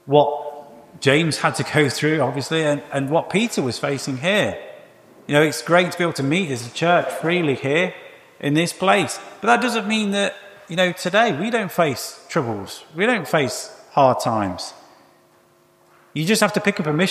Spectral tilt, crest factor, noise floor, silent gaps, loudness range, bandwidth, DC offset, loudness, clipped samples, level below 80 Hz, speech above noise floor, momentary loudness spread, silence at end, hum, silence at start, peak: -4.5 dB/octave; 20 dB; -56 dBFS; none; 3 LU; 15.5 kHz; under 0.1%; -20 LUFS; under 0.1%; -64 dBFS; 36 dB; 11 LU; 0 s; none; 0.05 s; -2 dBFS